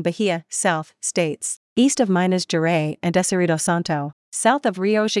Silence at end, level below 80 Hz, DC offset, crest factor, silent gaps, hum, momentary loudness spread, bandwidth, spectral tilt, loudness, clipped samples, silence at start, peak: 0 s; -66 dBFS; under 0.1%; 16 dB; 1.57-1.76 s, 4.13-4.32 s; none; 6 LU; 12 kHz; -4.5 dB/octave; -21 LUFS; under 0.1%; 0 s; -4 dBFS